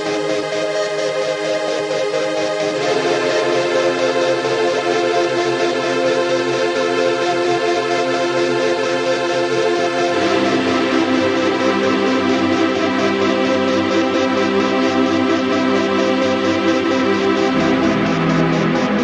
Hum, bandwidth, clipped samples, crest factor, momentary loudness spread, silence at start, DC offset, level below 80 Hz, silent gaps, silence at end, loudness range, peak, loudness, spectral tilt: none; 10.5 kHz; under 0.1%; 14 dB; 3 LU; 0 s; under 0.1%; -54 dBFS; none; 0 s; 1 LU; -2 dBFS; -17 LUFS; -4.5 dB/octave